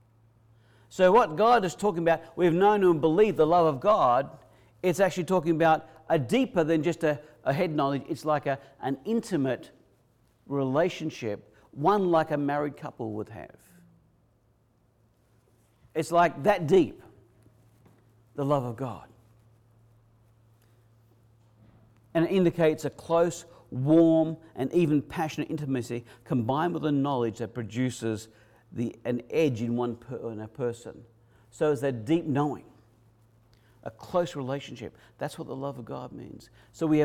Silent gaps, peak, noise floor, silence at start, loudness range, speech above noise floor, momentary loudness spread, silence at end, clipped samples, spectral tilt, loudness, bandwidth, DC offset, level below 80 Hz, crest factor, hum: none; -12 dBFS; -66 dBFS; 0.9 s; 12 LU; 40 dB; 16 LU; 0 s; under 0.1%; -7 dB/octave; -27 LUFS; 15 kHz; under 0.1%; -62 dBFS; 16 dB; none